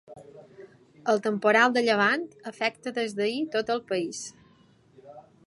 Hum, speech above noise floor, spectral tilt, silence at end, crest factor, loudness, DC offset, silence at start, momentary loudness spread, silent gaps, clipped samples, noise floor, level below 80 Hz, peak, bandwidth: none; 34 dB; -4 dB/octave; 0.25 s; 20 dB; -26 LUFS; under 0.1%; 0.1 s; 14 LU; none; under 0.1%; -59 dBFS; -74 dBFS; -6 dBFS; 11.5 kHz